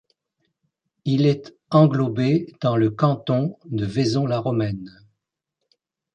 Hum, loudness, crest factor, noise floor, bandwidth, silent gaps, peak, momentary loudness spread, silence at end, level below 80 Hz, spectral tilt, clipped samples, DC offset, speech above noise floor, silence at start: none; -21 LUFS; 20 dB; -81 dBFS; 9.2 kHz; none; -4 dBFS; 11 LU; 1.25 s; -56 dBFS; -8 dB/octave; under 0.1%; under 0.1%; 60 dB; 1.05 s